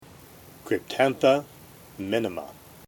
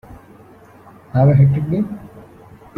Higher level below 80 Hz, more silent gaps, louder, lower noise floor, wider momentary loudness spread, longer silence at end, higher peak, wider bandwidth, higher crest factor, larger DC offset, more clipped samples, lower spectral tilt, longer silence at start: second, -64 dBFS vs -46 dBFS; neither; second, -25 LUFS vs -16 LUFS; first, -49 dBFS vs -44 dBFS; first, 24 LU vs 14 LU; second, 0.35 s vs 0.55 s; second, -6 dBFS vs -2 dBFS; first, 18.5 kHz vs 4.1 kHz; about the same, 20 dB vs 16 dB; neither; neither; second, -5 dB/octave vs -11.5 dB/octave; first, 0.65 s vs 0.1 s